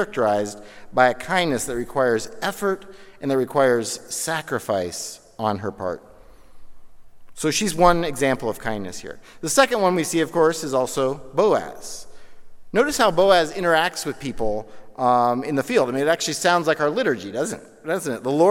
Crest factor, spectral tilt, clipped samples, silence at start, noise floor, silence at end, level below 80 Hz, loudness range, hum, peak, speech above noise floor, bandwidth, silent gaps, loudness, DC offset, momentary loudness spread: 20 dB; -4 dB/octave; under 0.1%; 0 s; -42 dBFS; 0 s; -46 dBFS; 4 LU; none; -2 dBFS; 21 dB; 17 kHz; none; -22 LUFS; under 0.1%; 14 LU